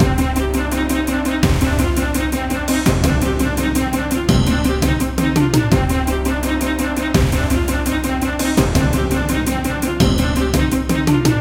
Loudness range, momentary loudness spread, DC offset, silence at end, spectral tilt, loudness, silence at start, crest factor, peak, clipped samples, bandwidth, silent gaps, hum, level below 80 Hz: 1 LU; 4 LU; under 0.1%; 0 s; -5.5 dB/octave; -17 LUFS; 0 s; 16 dB; 0 dBFS; under 0.1%; 17 kHz; none; none; -24 dBFS